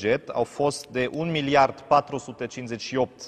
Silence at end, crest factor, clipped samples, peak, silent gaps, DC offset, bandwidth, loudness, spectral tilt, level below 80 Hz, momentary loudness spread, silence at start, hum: 0 s; 20 dB; under 0.1%; -6 dBFS; none; under 0.1%; 13.5 kHz; -25 LUFS; -5 dB/octave; -58 dBFS; 12 LU; 0 s; none